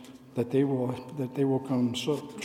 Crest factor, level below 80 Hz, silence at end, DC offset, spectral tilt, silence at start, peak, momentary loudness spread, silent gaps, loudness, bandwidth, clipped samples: 16 dB; -72 dBFS; 0 s; under 0.1%; -6.5 dB/octave; 0 s; -14 dBFS; 8 LU; none; -29 LUFS; 15 kHz; under 0.1%